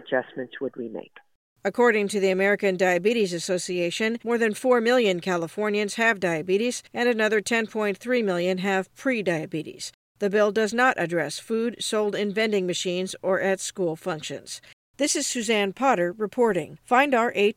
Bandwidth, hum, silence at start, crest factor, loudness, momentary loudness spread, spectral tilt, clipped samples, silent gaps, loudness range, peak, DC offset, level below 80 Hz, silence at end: 16 kHz; none; 0 s; 18 dB; -24 LUFS; 11 LU; -4 dB/octave; under 0.1%; 1.35-1.56 s, 9.94-10.15 s, 14.73-14.94 s; 3 LU; -6 dBFS; under 0.1%; -72 dBFS; 0.05 s